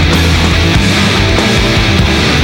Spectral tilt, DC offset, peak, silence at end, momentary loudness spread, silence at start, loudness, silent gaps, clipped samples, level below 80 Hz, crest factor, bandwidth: -4.5 dB/octave; under 0.1%; 0 dBFS; 0 s; 0 LU; 0 s; -9 LUFS; none; under 0.1%; -18 dBFS; 8 dB; 18.5 kHz